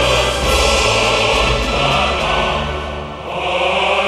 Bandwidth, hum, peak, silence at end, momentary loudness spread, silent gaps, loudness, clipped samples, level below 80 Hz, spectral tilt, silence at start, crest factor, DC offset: 14 kHz; none; 0 dBFS; 0 s; 10 LU; none; -15 LUFS; under 0.1%; -26 dBFS; -3 dB/octave; 0 s; 14 dB; under 0.1%